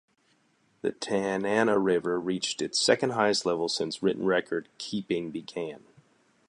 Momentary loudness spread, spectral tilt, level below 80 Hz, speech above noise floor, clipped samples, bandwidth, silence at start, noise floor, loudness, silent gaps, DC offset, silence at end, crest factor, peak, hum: 11 LU; -3.5 dB/octave; -68 dBFS; 40 dB; under 0.1%; 11.5 kHz; 0.85 s; -68 dBFS; -28 LUFS; none; under 0.1%; 0.7 s; 22 dB; -8 dBFS; none